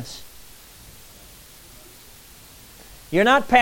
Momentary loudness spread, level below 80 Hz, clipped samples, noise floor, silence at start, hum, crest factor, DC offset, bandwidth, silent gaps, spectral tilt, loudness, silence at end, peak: 27 LU; -50 dBFS; under 0.1%; -46 dBFS; 0 s; none; 22 dB; under 0.1%; 17 kHz; none; -4 dB/octave; -18 LUFS; 0 s; -4 dBFS